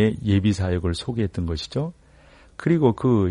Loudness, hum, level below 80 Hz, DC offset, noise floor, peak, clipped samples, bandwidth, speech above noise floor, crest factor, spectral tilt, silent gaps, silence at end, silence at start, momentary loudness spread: -23 LUFS; none; -42 dBFS; under 0.1%; -51 dBFS; -4 dBFS; under 0.1%; 10.5 kHz; 30 dB; 18 dB; -7.5 dB/octave; none; 0 s; 0 s; 10 LU